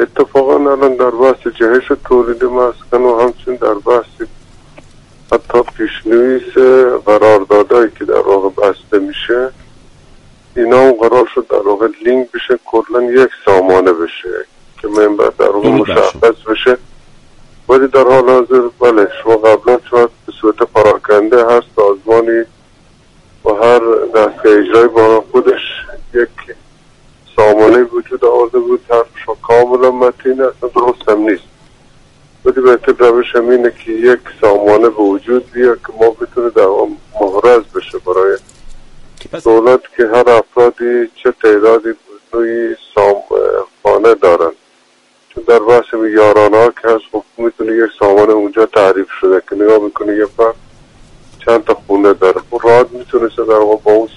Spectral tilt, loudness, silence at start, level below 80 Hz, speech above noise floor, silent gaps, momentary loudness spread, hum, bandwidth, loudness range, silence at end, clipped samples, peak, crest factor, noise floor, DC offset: -6 dB/octave; -10 LUFS; 0 s; -42 dBFS; 41 dB; none; 9 LU; none; 10.5 kHz; 3 LU; 0.1 s; 0.2%; 0 dBFS; 10 dB; -50 dBFS; under 0.1%